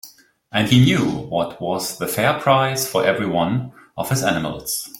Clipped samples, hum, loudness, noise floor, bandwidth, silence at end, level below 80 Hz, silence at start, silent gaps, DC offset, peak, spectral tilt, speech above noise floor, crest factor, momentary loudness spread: under 0.1%; none; -19 LUFS; -47 dBFS; 16.5 kHz; 0 s; -52 dBFS; 0.05 s; none; under 0.1%; -2 dBFS; -5 dB/octave; 28 dB; 18 dB; 10 LU